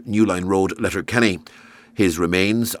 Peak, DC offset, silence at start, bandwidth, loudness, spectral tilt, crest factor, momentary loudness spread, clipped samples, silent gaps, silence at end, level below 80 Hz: -2 dBFS; under 0.1%; 0 s; 19.5 kHz; -20 LUFS; -5 dB/octave; 18 dB; 5 LU; under 0.1%; none; 0 s; -48 dBFS